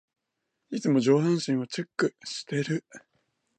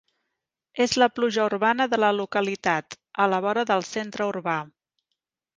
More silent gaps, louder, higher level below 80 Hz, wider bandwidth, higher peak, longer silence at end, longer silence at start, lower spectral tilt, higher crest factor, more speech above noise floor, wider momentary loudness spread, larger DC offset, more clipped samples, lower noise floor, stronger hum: neither; second, -27 LUFS vs -24 LUFS; second, -76 dBFS vs -66 dBFS; about the same, 9.2 kHz vs 9.8 kHz; second, -10 dBFS vs -4 dBFS; second, 0.6 s vs 0.9 s; about the same, 0.7 s vs 0.75 s; first, -6 dB/octave vs -4 dB/octave; about the same, 18 dB vs 20 dB; second, 55 dB vs 59 dB; about the same, 11 LU vs 9 LU; neither; neither; about the same, -82 dBFS vs -83 dBFS; neither